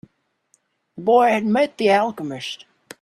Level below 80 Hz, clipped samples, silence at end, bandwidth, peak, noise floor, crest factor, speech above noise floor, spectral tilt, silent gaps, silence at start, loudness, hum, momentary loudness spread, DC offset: -70 dBFS; under 0.1%; 0.45 s; 13 kHz; -4 dBFS; -65 dBFS; 16 dB; 46 dB; -5.5 dB/octave; none; 0.95 s; -19 LUFS; none; 15 LU; under 0.1%